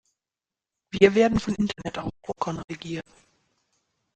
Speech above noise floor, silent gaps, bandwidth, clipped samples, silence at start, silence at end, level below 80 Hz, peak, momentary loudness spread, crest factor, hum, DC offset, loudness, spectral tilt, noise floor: over 66 dB; 2.64-2.68 s; 9 kHz; under 0.1%; 0.95 s; 1.15 s; -50 dBFS; -4 dBFS; 17 LU; 24 dB; none; under 0.1%; -25 LUFS; -6 dB/octave; under -90 dBFS